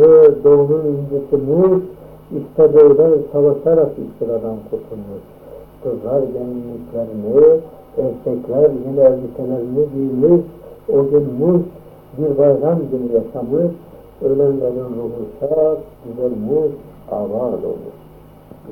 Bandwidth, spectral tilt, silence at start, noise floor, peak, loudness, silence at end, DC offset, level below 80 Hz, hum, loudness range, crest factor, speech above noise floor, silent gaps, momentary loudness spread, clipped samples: 3.1 kHz; -11.5 dB/octave; 0 s; -40 dBFS; 0 dBFS; -16 LUFS; 0 s; under 0.1%; -48 dBFS; none; 7 LU; 16 dB; 25 dB; none; 16 LU; under 0.1%